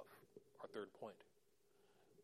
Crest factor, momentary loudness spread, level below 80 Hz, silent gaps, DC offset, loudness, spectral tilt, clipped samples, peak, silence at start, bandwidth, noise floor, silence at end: 22 dB; 14 LU; under -90 dBFS; none; under 0.1%; -56 LUFS; -5 dB/octave; under 0.1%; -36 dBFS; 0 s; 15 kHz; -78 dBFS; 0 s